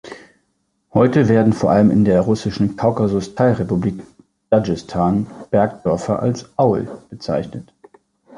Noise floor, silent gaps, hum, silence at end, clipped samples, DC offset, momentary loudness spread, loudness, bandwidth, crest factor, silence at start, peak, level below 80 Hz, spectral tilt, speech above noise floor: -67 dBFS; none; none; 0.75 s; under 0.1%; under 0.1%; 10 LU; -17 LUFS; 10.5 kHz; 16 dB; 0.05 s; -2 dBFS; -44 dBFS; -8 dB/octave; 51 dB